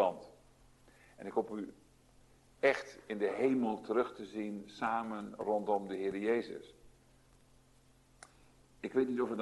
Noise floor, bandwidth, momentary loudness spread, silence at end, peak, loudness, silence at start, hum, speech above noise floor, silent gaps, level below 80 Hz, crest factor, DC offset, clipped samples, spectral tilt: -66 dBFS; 12 kHz; 13 LU; 0 s; -16 dBFS; -36 LUFS; 0 s; none; 30 dB; none; -70 dBFS; 22 dB; under 0.1%; under 0.1%; -6 dB/octave